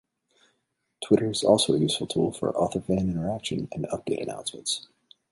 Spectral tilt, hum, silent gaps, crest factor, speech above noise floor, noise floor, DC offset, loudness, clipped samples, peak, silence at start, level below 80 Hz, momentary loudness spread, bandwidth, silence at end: -5 dB/octave; none; none; 22 dB; 51 dB; -76 dBFS; under 0.1%; -26 LUFS; under 0.1%; -6 dBFS; 1 s; -54 dBFS; 11 LU; 11.5 kHz; 0.5 s